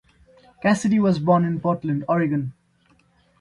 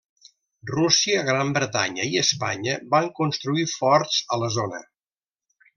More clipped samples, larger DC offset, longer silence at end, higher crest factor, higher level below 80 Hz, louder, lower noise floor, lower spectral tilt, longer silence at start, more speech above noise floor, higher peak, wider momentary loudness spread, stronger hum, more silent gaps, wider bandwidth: neither; neither; about the same, 0.9 s vs 0.95 s; about the same, 18 dB vs 20 dB; first, -58 dBFS vs -66 dBFS; about the same, -21 LUFS vs -22 LUFS; second, -61 dBFS vs under -90 dBFS; first, -7.5 dB/octave vs -3.5 dB/octave; about the same, 0.65 s vs 0.65 s; second, 41 dB vs over 67 dB; about the same, -4 dBFS vs -4 dBFS; second, 6 LU vs 9 LU; neither; neither; about the same, 11.5 kHz vs 11 kHz